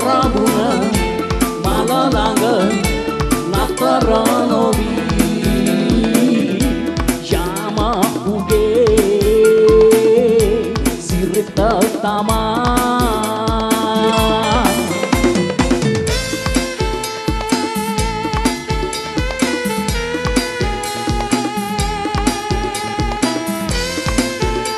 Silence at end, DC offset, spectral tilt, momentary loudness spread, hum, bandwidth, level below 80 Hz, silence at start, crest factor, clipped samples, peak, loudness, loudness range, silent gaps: 0 s; under 0.1%; -5 dB/octave; 7 LU; none; 13 kHz; -26 dBFS; 0 s; 16 dB; under 0.1%; 0 dBFS; -16 LUFS; 6 LU; none